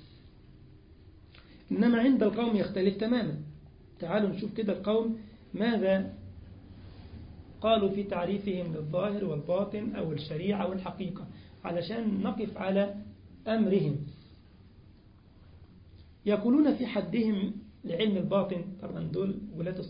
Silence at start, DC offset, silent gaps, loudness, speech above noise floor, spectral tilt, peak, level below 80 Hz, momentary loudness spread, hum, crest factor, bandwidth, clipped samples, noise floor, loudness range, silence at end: 0 s; under 0.1%; none; -30 LUFS; 27 dB; -11 dB/octave; -14 dBFS; -58 dBFS; 18 LU; none; 18 dB; 5.2 kHz; under 0.1%; -56 dBFS; 4 LU; 0 s